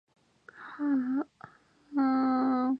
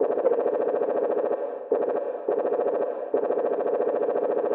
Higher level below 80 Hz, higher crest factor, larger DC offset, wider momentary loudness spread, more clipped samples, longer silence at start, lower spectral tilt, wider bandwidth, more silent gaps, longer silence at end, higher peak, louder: first, -82 dBFS vs -88 dBFS; about the same, 14 dB vs 14 dB; neither; first, 17 LU vs 4 LU; neither; first, 0.55 s vs 0 s; first, -7.5 dB/octave vs -5.5 dB/octave; first, 5 kHz vs 3.8 kHz; neither; about the same, 0 s vs 0 s; second, -18 dBFS vs -10 dBFS; second, -29 LUFS vs -26 LUFS